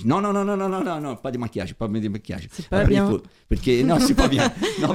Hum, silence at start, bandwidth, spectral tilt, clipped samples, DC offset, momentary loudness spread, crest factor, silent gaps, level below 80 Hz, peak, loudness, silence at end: none; 0 s; 16.5 kHz; -6 dB/octave; under 0.1%; under 0.1%; 11 LU; 20 dB; none; -34 dBFS; -2 dBFS; -22 LUFS; 0 s